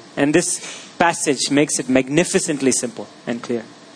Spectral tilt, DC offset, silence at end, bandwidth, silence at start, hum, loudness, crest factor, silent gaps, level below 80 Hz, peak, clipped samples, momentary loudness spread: -3.5 dB/octave; under 0.1%; 0.05 s; 10.5 kHz; 0 s; none; -19 LUFS; 20 dB; none; -56 dBFS; 0 dBFS; under 0.1%; 11 LU